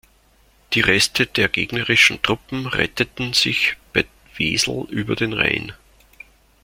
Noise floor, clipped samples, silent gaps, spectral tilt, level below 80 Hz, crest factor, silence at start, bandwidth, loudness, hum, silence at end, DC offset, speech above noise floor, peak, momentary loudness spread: -56 dBFS; under 0.1%; none; -3 dB/octave; -46 dBFS; 20 dB; 0.7 s; 16.5 kHz; -18 LUFS; none; 0.9 s; under 0.1%; 36 dB; -2 dBFS; 10 LU